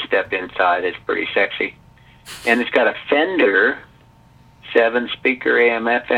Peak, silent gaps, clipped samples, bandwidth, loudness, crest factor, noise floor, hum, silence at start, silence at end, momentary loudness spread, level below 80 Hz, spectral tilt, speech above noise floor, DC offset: 0 dBFS; none; under 0.1%; 14.5 kHz; -18 LUFS; 18 dB; -49 dBFS; none; 0 s; 0 s; 9 LU; -56 dBFS; -4 dB/octave; 31 dB; under 0.1%